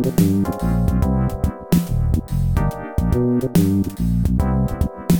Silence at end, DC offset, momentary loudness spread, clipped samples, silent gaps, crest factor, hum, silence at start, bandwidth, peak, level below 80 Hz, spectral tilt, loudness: 0 s; under 0.1%; 5 LU; under 0.1%; none; 16 dB; none; 0 s; 18 kHz; -2 dBFS; -26 dBFS; -8 dB/octave; -20 LUFS